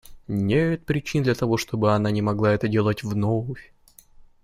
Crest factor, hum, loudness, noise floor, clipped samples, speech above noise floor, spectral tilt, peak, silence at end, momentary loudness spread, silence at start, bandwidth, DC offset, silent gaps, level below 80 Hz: 16 dB; none; -23 LUFS; -50 dBFS; under 0.1%; 28 dB; -7 dB/octave; -6 dBFS; 0.25 s; 6 LU; 0.1 s; 15 kHz; under 0.1%; none; -50 dBFS